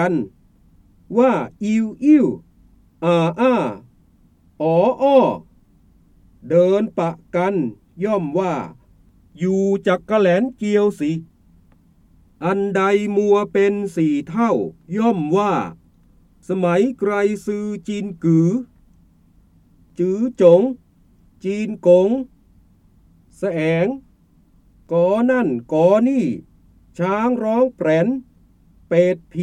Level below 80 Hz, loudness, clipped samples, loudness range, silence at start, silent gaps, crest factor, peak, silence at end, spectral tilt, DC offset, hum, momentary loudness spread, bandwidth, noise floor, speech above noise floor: -56 dBFS; -18 LUFS; under 0.1%; 3 LU; 0 s; none; 18 dB; 0 dBFS; 0 s; -7.5 dB/octave; under 0.1%; none; 12 LU; 11 kHz; -54 dBFS; 37 dB